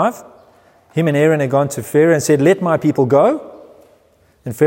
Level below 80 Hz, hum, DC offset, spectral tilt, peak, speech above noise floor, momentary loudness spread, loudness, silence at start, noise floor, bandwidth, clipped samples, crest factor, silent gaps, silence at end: -60 dBFS; none; under 0.1%; -6.5 dB/octave; -2 dBFS; 40 dB; 12 LU; -15 LUFS; 0 s; -54 dBFS; 16.5 kHz; under 0.1%; 14 dB; none; 0 s